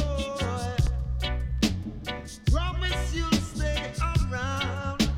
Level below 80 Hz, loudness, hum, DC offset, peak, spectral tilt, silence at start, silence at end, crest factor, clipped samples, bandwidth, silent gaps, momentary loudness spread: -30 dBFS; -29 LUFS; none; under 0.1%; -10 dBFS; -5 dB/octave; 0 s; 0 s; 18 dB; under 0.1%; 16 kHz; none; 4 LU